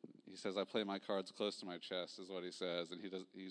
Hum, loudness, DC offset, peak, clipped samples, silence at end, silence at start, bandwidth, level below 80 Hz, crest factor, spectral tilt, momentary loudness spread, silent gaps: none; -44 LUFS; under 0.1%; -26 dBFS; under 0.1%; 0 s; 0 s; 10.5 kHz; under -90 dBFS; 20 dB; -4.5 dB/octave; 8 LU; none